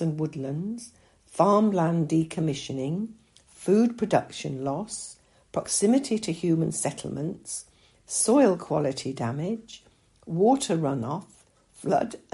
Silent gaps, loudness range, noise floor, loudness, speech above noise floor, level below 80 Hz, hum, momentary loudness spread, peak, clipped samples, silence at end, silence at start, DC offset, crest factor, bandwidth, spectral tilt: none; 3 LU; -55 dBFS; -26 LUFS; 29 dB; -64 dBFS; none; 14 LU; -6 dBFS; under 0.1%; 0.15 s; 0 s; under 0.1%; 20 dB; 11.5 kHz; -5.5 dB/octave